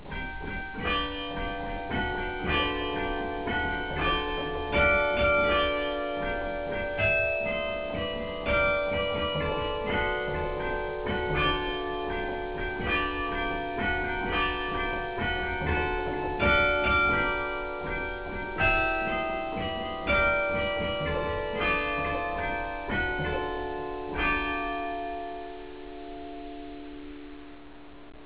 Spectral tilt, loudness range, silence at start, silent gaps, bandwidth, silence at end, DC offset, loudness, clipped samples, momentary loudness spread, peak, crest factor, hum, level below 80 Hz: -2.5 dB/octave; 5 LU; 0 s; none; 4 kHz; 0 s; 0.4%; -28 LUFS; under 0.1%; 12 LU; -12 dBFS; 18 dB; none; -40 dBFS